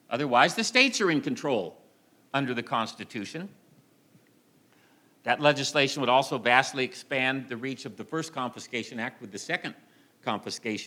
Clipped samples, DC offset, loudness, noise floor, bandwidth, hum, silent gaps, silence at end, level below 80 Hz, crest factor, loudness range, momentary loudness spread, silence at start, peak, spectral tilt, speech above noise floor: under 0.1%; under 0.1%; -27 LUFS; -62 dBFS; 16.5 kHz; none; none; 0 s; -80 dBFS; 24 dB; 9 LU; 15 LU; 0.1 s; -4 dBFS; -3.5 dB/octave; 35 dB